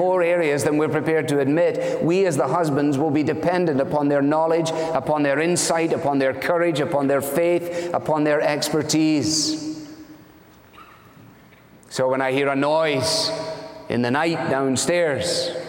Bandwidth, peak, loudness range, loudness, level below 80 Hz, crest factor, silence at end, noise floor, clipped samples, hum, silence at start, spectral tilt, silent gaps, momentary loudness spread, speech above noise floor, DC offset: 17 kHz; -6 dBFS; 5 LU; -21 LUFS; -60 dBFS; 14 dB; 0 s; -49 dBFS; under 0.1%; none; 0 s; -4.5 dB/octave; none; 5 LU; 29 dB; under 0.1%